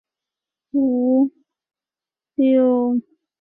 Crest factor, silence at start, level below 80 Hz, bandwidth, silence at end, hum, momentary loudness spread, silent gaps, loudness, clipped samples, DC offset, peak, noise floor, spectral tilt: 14 dB; 0.75 s; -68 dBFS; 3.6 kHz; 0.4 s; none; 9 LU; none; -19 LUFS; under 0.1%; under 0.1%; -8 dBFS; under -90 dBFS; -11 dB/octave